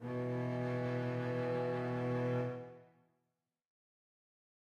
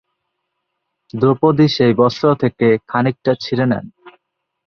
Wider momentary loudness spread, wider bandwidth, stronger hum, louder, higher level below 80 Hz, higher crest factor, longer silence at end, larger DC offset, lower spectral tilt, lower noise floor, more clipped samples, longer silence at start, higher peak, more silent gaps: about the same, 4 LU vs 6 LU; about the same, 7.2 kHz vs 6.8 kHz; neither; second, -38 LUFS vs -15 LUFS; second, -74 dBFS vs -54 dBFS; about the same, 14 dB vs 16 dB; first, 1.95 s vs 0.6 s; neither; about the same, -8.5 dB/octave vs -7.5 dB/octave; first, -87 dBFS vs -74 dBFS; neither; second, 0 s vs 1.15 s; second, -26 dBFS vs -2 dBFS; neither